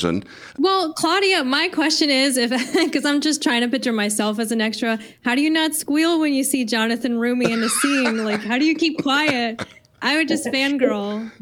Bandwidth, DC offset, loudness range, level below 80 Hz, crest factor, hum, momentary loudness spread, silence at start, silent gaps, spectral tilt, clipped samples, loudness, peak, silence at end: 19.5 kHz; under 0.1%; 2 LU; -64 dBFS; 16 dB; none; 7 LU; 0 s; none; -3 dB/octave; under 0.1%; -19 LUFS; -4 dBFS; 0.1 s